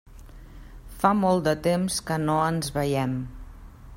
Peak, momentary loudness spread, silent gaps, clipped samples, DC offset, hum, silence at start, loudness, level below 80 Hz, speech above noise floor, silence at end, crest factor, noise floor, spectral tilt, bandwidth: -6 dBFS; 13 LU; none; under 0.1%; under 0.1%; none; 0.1 s; -25 LUFS; -46 dBFS; 20 dB; 0 s; 20 dB; -44 dBFS; -5.5 dB/octave; 16.5 kHz